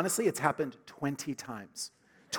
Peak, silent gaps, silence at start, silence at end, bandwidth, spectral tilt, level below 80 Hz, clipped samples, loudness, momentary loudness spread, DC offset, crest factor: -10 dBFS; none; 0 s; 0 s; 19 kHz; -4 dB/octave; -76 dBFS; under 0.1%; -34 LUFS; 12 LU; under 0.1%; 24 dB